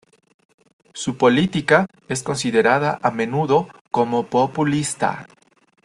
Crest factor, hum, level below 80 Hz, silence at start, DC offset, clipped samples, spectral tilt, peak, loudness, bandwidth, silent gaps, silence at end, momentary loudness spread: 20 dB; none; -58 dBFS; 0.95 s; under 0.1%; under 0.1%; -5 dB/octave; -2 dBFS; -20 LUFS; 12.5 kHz; 3.81-3.85 s; 0.6 s; 9 LU